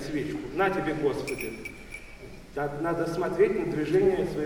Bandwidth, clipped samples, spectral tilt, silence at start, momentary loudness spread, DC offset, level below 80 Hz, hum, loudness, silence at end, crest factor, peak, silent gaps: 17.5 kHz; under 0.1%; -6.5 dB/octave; 0 s; 18 LU; under 0.1%; -50 dBFS; none; -28 LUFS; 0 s; 16 dB; -12 dBFS; none